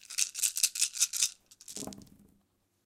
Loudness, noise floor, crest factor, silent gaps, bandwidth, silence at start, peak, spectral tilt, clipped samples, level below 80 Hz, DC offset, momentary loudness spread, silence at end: -29 LUFS; -73 dBFS; 28 dB; none; 17 kHz; 0.1 s; -6 dBFS; 1.5 dB/octave; under 0.1%; -72 dBFS; under 0.1%; 15 LU; 0.8 s